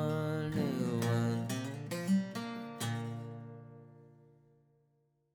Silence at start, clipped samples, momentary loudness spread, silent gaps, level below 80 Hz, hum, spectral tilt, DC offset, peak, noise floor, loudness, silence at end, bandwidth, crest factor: 0 s; under 0.1%; 17 LU; none; -70 dBFS; none; -6.5 dB/octave; under 0.1%; -22 dBFS; -75 dBFS; -36 LUFS; 1.25 s; 19 kHz; 16 dB